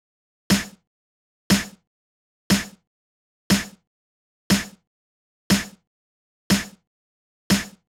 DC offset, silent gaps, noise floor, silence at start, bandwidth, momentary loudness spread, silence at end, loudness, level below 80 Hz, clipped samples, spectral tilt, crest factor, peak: under 0.1%; 0.87-1.50 s, 1.87-2.50 s, 2.87-3.50 s, 3.87-4.50 s, 4.87-5.50 s, 5.87-6.50 s, 6.87-7.50 s; under -90 dBFS; 0.5 s; 18.5 kHz; 16 LU; 0.3 s; -23 LUFS; -50 dBFS; under 0.1%; -4 dB/octave; 20 dB; -8 dBFS